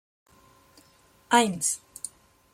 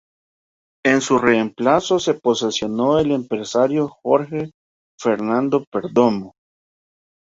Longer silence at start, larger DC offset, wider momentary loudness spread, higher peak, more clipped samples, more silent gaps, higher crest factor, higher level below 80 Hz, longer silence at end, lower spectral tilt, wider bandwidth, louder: first, 1.3 s vs 0.85 s; neither; first, 18 LU vs 6 LU; second, -6 dBFS vs -2 dBFS; neither; second, none vs 4.54-4.98 s, 5.67-5.72 s; first, 24 dB vs 18 dB; second, -70 dBFS vs -56 dBFS; second, 0.45 s vs 0.9 s; second, -2.5 dB/octave vs -5 dB/octave; first, 16.5 kHz vs 8 kHz; second, -25 LUFS vs -19 LUFS